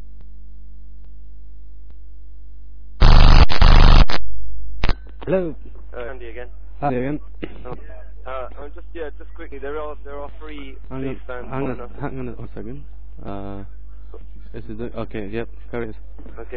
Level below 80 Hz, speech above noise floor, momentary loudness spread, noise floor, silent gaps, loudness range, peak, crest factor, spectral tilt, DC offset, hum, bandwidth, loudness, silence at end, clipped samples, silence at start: -20 dBFS; 13 dB; 30 LU; -40 dBFS; none; 15 LU; 0 dBFS; 16 dB; -7 dB/octave; 5%; 50 Hz at -35 dBFS; 5.4 kHz; -23 LUFS; 0 s; under 0.1%; 0 s